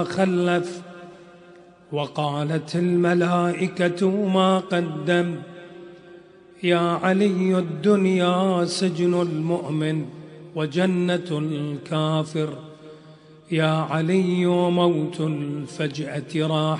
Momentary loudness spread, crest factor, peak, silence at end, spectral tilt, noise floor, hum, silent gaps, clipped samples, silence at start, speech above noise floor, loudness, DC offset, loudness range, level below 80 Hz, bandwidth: 11 LU; 18 dB; -6 dBFS; 0 s; -6.5 dB/octave; -48 dBFS; none; none; under 0.1%; 0 s; 27 dB; -22 LUFS; under 0.1%; 4 LU; -68 dBFS; 10.5 kHz